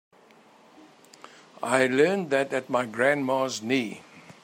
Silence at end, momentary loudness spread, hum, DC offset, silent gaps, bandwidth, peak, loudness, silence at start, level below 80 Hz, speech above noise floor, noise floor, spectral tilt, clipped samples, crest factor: 0.1 s; 10 LU; none; under 0.1%; none; 16 kHz; -6 dBFS; -25 LUFS; 1.6 s; -76 dBFS; 31 dB; -56 dBFS; -4.5 dB/octave; under 0.1%; 20 dB